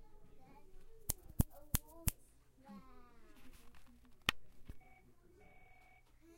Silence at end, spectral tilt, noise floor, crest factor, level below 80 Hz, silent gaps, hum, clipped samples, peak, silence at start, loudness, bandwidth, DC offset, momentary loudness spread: 0 s; -3 dB/octave; -65 dBFS; 34 dB; -52 dBFS; none; none; under 0.1%; -12 dBFS; 0 s; -41 LUFS; 16.5 kHz; under 0.1%; 26 LU